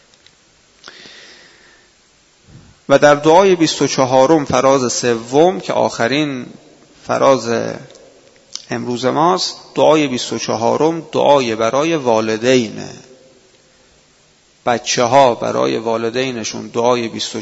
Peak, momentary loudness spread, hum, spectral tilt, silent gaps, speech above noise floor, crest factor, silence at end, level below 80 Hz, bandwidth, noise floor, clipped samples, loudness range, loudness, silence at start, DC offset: 0 dBFS; 13 LU; none; -4 dB/octave; none; 38 dB; 16 dB; 0 s; -56 dBFS; 8 kHz; -53 dBFS; under 0.1%; 6 LU; -15 LUFS; 1.05 s; under 0.1%